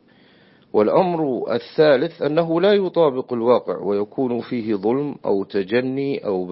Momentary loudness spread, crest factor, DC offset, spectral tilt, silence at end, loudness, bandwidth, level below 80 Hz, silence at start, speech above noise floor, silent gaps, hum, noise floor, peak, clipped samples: 7 LU; 16 dB; under 0.1%; -11 dB/octave; 0 s; -20 LUFS; 5.8 kHz; -66 dBFS; 0.75 s; 33 dB; none; none; -52 dBFS; -4 dBFS; under 0.1%